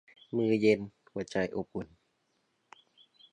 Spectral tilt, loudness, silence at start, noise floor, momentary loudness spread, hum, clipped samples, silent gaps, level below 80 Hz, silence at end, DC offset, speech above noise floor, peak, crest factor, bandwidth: -6.5 dB/octave; -32 LUFS; 0.35 s; -76 dBFS; 15 LU; none; under 0.1%; none; -66 dBFS; 1.45 s; under 0.1%; 46 dB; -12 dBFS; 22 dB; 9.4 kHz